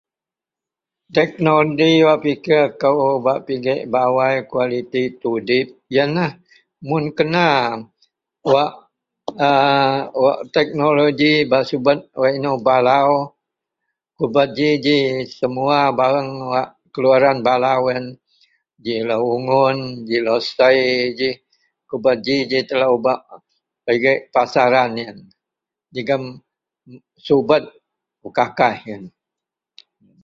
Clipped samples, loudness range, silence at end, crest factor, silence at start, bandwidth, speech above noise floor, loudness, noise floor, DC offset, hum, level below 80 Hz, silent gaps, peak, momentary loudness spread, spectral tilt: under 0.1%; 5 LU; 1.15 s; 16 dB; 1.15 s; 7.4 kHz; 72 dB; -17 LUFS; -88 dBFS; under 0.1%; none; -60 dBFS; none; -2 dBFS; 11 LU; -6.5 dB/octave